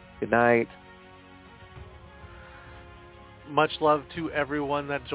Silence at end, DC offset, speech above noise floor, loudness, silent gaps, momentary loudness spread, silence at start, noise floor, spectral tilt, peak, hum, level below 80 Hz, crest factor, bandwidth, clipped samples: 0 s; under 0.1%; 24 dB; -26 LUFS; none; 25 LU; 0.15 s; -50 dBFS; -9.5 dB/octave; -8 dBFS; none; -54 dBFS; 22 dB; 4 kHz; under 0.1%